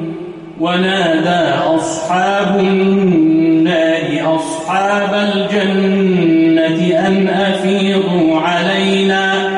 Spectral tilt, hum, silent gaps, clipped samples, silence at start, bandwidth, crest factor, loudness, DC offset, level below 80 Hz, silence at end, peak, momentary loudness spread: -5.5 dB/octave; none; none; under 0.1%; 0 s; 11 kHz; 10 dB; -13 LUFS; under 0.1%; -52 dBFS; 0 s; -2 dBFS; 5 LU